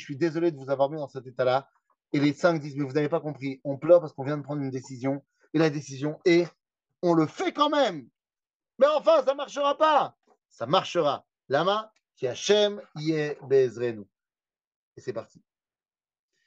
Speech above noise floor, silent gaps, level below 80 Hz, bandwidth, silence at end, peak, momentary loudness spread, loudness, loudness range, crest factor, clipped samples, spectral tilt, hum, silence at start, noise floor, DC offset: over 65 dB; 8.55-8.60 s, 14.67-14.92 s; -82 dBFS; 8 kHz; 1.25 s; -6 dBFS; 12 LU; -26 LUFS; 3 LU; 20 dB; under 0.1%; -5.5 dB/octave; none; 0 s; under -90 dBFS; under 0.1%